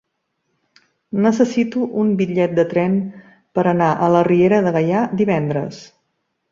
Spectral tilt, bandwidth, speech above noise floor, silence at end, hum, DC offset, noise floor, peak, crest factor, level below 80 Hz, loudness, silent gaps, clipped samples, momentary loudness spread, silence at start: -8 dB/octave; 7.6 kHz; 56 dB; 0.65 s; none; under 0.1%; -72 dBFS; -2 dBFS; 16 dB; -58 dBFS; -17 LUFS; none; under 0.1%; 9 LU; 1.15 s